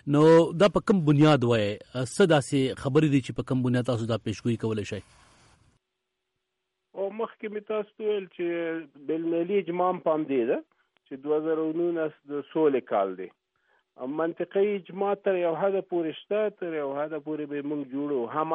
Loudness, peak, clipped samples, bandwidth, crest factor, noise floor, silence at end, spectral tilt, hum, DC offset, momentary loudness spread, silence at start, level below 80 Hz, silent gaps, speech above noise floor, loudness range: -27 LUFS; -10 dBFS; under 0.1%; 11.5 kHz; 16 dB; -82 dBFS; 0 s; -7 dB/octave; none; under 0.1%; 12 LU; 0.05 s; -62 dBFS; none; 56 dB; 10 LU